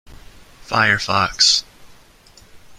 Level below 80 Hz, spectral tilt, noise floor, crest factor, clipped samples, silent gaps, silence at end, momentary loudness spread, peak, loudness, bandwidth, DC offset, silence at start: -46 dBFS; -1.5 dB/octave; -48 dBFS; 20 dB; under 0.1%; none; 0.05 s; 6 LU; -2 dBFS; -15 LUFS; 16 kHz; under 0.1%; 0.1 s